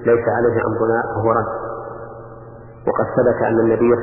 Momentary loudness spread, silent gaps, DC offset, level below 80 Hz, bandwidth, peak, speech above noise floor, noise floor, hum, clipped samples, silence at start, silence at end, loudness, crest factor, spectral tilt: 20 LU; none; under 0.1%; -46 dBFS; 2.9 kHz; -4 dBFS; 21 dB; -38 dBFS; none; under 0.1%; 0 s; 0 s; -18 LUFS; 14 dB; -13 dB/octave